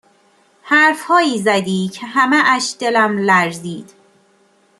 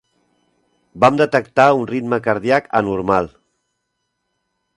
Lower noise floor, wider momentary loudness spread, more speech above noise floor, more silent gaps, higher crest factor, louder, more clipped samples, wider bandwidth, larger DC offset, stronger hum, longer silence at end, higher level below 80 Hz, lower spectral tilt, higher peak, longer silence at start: second, -55 dBFS vs -73 dBFS; first, 9 LU vs 6 LU; second, 40 dB vs 57 dB; neither; about the same, 16 dB vs 18 dB; about the same, -14 LUFS vs -16 LUFS; neither; first, 13 kHz vs 11 kHz; neither; second, none vs 60 Hz at -45 dBFS; second, 0.95 s vs 1.5 s; second, -66 dBFS vs -52 dBFS; second, -4 dB/octave vs -6.5 dB/octave; about the same, -2 dBFS vs 0 dBFS; second, 0.65 s vs 0.95 s